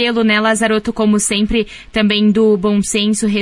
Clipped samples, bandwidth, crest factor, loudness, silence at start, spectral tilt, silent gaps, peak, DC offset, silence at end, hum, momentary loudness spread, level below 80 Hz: under 0.1%; 11.5 kHz; 12 dB; -14 LUFS; 0 s; -4 dB/octave; none; -2 dBFS; under 0.1%; 0 s; none; 5 LU; -38 dBFS